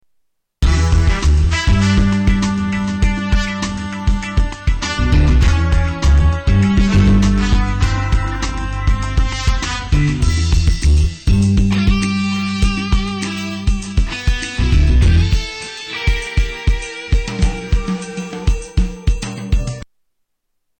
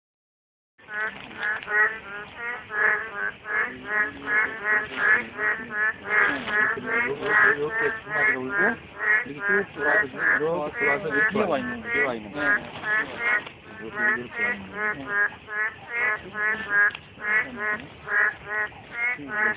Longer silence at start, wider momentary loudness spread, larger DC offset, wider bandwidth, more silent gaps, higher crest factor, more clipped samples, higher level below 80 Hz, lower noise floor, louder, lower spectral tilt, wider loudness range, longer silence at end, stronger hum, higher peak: second, 0.6 s vs 0.9 s; about the same, 8 LU vs 9 LU; neither; first, 9 kHz vs 4 kHz; neither; second, 10 dB vs 20 dB; neither; first, -16 dBFS vs -58 dBFS; second, -69 dBFS vs under -90 dBFS; first, -17 LUFS vs -24 LUFS; first, -5.5 dB/octave vs -2 dB/octave; about the same, 6 LU vs 4 LU; first, 0.95 s vs 0 s; neither; about the same, -6 dBFS vs -6 dBFS